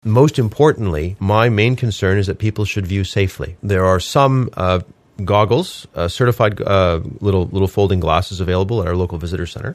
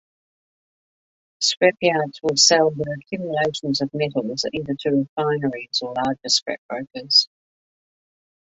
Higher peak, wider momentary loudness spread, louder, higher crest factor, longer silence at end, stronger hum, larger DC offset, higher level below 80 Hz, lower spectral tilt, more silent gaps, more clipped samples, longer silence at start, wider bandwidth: about the same, 0 dBFS vs -2 dBFS; second, 7 LU vs 13 LU; first, -17 LUFS vs -20 LUFS; about the same, 16 dB vs 20 dB; second, 0 s vs 1.2 s; neither; neither; first, -36 dBFS vs -62 dBFS; first, -6.5 dB/octave vs -3 dB/octave; second, none vs 5.09-5.16 s, 6.42-6.46 s, 6.58-6.69 s; neither; second, 0.05 s vs 1.4 s; first, 15 kHz vs 8.2 kHz